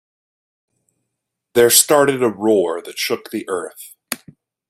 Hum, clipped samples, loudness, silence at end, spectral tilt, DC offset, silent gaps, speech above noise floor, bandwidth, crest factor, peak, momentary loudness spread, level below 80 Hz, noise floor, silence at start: none; under 0.1%; -16 LUFS; 0.55 s; -2.5 dB/octave; under 0.1%; none; 62 dB; 16 kHz; 20 dB; 0 dBFS; 18 LU; -64 dBFS; -78 dBFS; 1.55 s